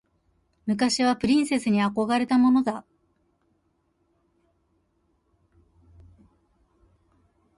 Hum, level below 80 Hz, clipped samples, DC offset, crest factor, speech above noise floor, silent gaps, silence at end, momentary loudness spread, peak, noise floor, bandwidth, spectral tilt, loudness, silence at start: none; -60 dBFS; under 0.1%; under 0.1%; 16 dB; 48 dB; none; 4.75 s; 10 LU; -12 dBFS; -70 dBFS; 11.5 kHz; -4.5 dB/octave; -23 LUFS; 0.65 s